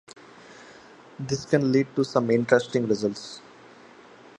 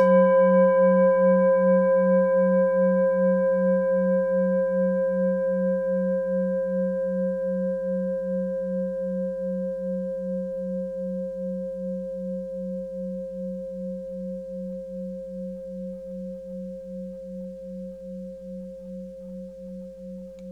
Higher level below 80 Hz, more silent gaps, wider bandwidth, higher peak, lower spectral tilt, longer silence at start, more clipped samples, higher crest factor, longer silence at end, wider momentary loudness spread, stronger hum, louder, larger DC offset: second, -66 dBFS vs -58 dBFS; neither; first, 11 kHz vs 3.2 kHz; first, -2 dBFS vs -10 dBFS; second, -6 dB/octave vs -10.5 dB/octave; first, 0.5 s vs 0 s; neither; first, 24 dB vs 16 dB; first, 1 s vs 0 s; about the same, 18 LU vs 19 LU; neither; about the same, -24 LUFS vs -24 LUFS; neither